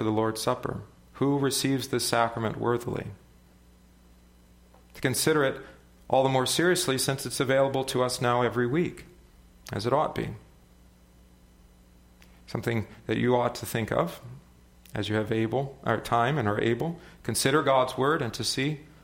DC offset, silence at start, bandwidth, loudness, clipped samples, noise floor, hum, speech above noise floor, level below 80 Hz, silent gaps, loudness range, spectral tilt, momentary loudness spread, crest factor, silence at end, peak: under 0.1%; 0 s; 16.5 kHz; -27 LUFS; under 0.1%; -56 dBFS; none; 29 dB; -56 dBFS; none; 7 LU; -4.5 dB/octave; 12 LU; 20 dB; 0.2 s; -8 dBFS